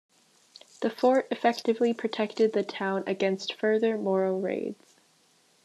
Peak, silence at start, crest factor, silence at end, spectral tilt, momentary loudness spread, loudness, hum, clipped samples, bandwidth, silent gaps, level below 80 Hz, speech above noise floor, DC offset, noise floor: -8 dBFS; 0.8 s; 20 dB; 0.9 s; -5.5 dB/octave; 7 LU; -27 LUFS; none; under 0.1%; 12.5 kHz; none; -86 dBFS; 38 dB; under 0.1%; -64 dBFS